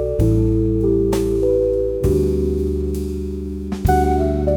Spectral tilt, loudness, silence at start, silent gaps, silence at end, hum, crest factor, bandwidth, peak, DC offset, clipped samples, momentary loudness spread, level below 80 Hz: -8.5 dB/octave; -19 LUFS; 0 s; none; 0 s; none; 14 dB; 19 kHz; -4 dBFS; under 0.1%; under 0.1%; 9 LU; -26 dBFS